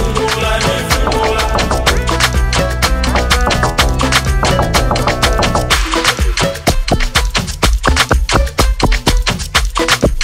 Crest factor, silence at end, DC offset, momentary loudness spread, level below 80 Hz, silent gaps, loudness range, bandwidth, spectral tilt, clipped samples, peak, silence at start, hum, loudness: 12 dB; 0 s; under 0.1%; 3 LU; -16 dBFS; none; 1 LU; 16.5 kHz; -3.5 dB/octave; under 0.1%; 0 dBFS; 0 s; none; -13 LUFS